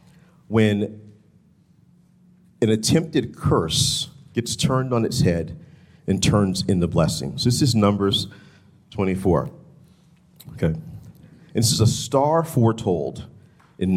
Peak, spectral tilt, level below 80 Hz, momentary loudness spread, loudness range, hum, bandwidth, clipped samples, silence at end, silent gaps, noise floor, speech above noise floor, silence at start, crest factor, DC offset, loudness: -4 dBFS; -5 dB/octave; -48 dBFS; 14 LU; 3 LU; none; 16 kHz; under 0.1%; 0 s; none; -56 dBFS; 36 dB; 0.5 s; 18 dB; under 0.1%; -21 LUFS